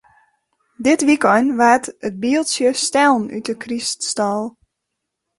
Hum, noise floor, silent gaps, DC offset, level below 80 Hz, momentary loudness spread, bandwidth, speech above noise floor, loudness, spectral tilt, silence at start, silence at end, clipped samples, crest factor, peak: none; -78 dBFS; none; under 0.1%; -60 dBFS; 11 LU; 11.5 kHz; 61 dB; -17 LUFS; -3 dB/octave; 0.8 s; 0.9 s; under 0.1%; 16 dB; -2 dBFS